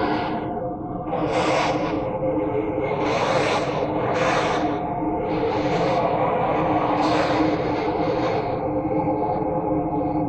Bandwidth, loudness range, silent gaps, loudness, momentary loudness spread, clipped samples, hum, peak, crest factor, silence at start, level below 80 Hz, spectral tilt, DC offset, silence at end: 9.2 kHz; 1 LU; none; -23 LUFS; 4 LU; under 0.1%; none; -8 dBFS; 14 dB; 0 s; -44 dBFS; -6.5 dB/octave; under 0.1%; 0 s